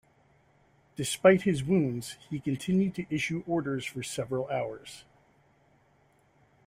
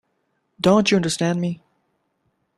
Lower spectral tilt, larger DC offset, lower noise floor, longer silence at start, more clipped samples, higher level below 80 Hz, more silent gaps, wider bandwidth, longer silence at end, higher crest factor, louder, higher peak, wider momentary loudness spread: about the same, -5.5 dB/octave vs -5 dB/octave; neither; second, -66 dBFS vs -71 dBFS; first, 1 s vs 0.65 s; neither; second, -64 dBFS vs -58 dBFS; neither; first, 16 kHz vs 12 kHz; first, 1.65 s vs 1.05 s; about the same, 24 dB vs 20 dB; second, -29 LUFS vs -20 LUFS; second, -8 dBFS vs -2 dBFS; first, 15 LU vs 11 LU